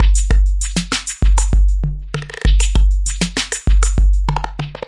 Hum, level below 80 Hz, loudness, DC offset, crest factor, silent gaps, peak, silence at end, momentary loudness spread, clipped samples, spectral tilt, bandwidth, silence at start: none; -14 dBFS; -18 LUFS; under 0.1%; 14 dB; none; 0 dBFS; 0.1 s; 7 LU; under 0.1%; -4 dB/octave; 11.5 kHz; 0 s